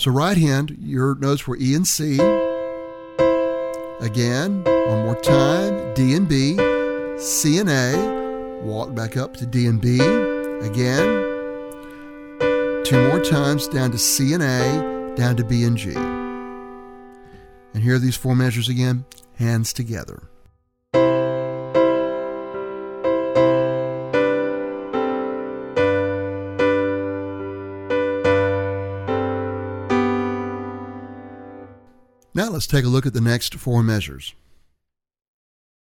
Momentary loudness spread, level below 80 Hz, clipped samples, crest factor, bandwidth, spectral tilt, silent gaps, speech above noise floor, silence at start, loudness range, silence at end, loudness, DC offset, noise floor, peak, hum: 13 LU; -46 dBFS; under 0.1%; 18 dB; 16.5 kHz; -5.5 dB/octave; none; 57 dB; 0 s; 5 LU; 1.55 s; -20 LUFS; under 0.1%; -75 dBFS; -2 dBFS; none